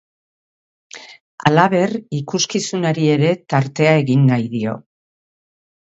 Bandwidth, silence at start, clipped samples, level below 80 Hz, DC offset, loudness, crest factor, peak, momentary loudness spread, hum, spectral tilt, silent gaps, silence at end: 8 kHz; 0.95 s; under 0.1%; -60 dBFS; under 0.1%; -17 LUFS; 18 dB; 0 dBFS; 12 LU; none; -5.5 dB/octave; 1.21-1.38 s; 1.15 s